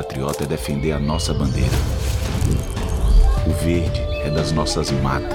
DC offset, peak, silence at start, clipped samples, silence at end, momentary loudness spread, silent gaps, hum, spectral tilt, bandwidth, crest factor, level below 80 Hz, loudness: under 0.1%; -4 dBFS; 0 s; under 0.1%; 0 s; 4 LU; none; none; -5.5 dB/octave; 17 kHz; 14 dB; -22 dBFS; -21 LUFS